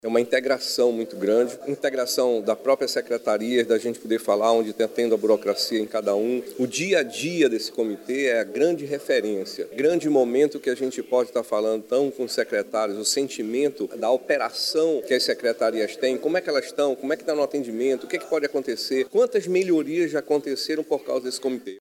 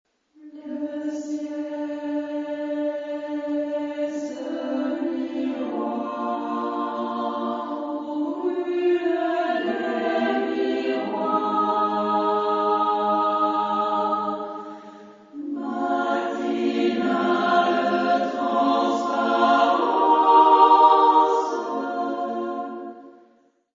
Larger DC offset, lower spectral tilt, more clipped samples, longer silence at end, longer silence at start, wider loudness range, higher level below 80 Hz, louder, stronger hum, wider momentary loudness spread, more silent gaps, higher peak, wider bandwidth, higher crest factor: neither; second, -3.5 dB/octave vs -5.5 dB/octave; neither; second, 0 s vs 0.6 s; second, 0.05 s vs 0.45 s; second, 2 LU vs 10 LU; about the same, -78 dBFS vs -74 dBFS; about the same, -24 LUFS vs -23 LUFS; neither; second, 5 LU vs 12 LU; neither; about the same, -6 dBFS vs -4 dBFS; first, 17 kHz vs 7.6 kHz; about the same, 16 dB vs 20 dB